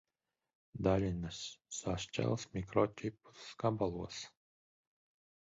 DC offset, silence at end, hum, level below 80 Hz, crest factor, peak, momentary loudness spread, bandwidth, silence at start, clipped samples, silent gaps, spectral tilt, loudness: under 0.1%; 1.2 s; none; -58 dBFS; 22 dB; -18 dBFS; 14 LU; 7.6 kHz; 0.75 s; under 0.1%; none; -6 dB/octave; -38 LUFS